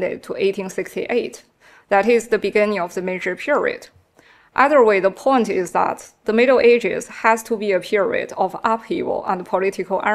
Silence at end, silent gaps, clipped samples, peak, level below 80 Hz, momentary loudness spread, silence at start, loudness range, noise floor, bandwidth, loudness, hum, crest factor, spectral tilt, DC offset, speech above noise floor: 0 s; none; under 0.1%; 0 dBFS; -60 dBFS; 10 LU; 0 s; 4 LU; -52 dBFS; 14 kHz; -19 LUFS; none; 20 dB; -5 dB/octave; under 0.1%; 34 dB